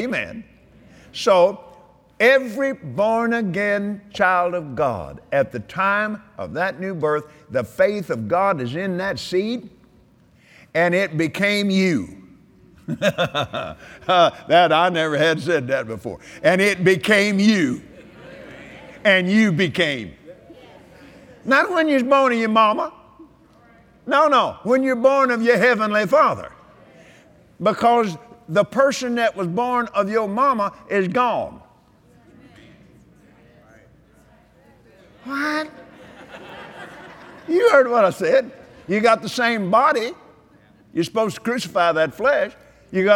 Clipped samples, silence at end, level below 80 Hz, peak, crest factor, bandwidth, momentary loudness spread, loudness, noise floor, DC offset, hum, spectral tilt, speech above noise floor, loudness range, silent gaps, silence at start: under 0.1%; 0 s; -58 dBFS; 0 dBFS; 20 dB; 16.5 kHz; 18 LU; -19 LUFS; -54 dBFS; under 0.1%; none; -5 dB/octave; 35 dB; 5 LU; none; 0 s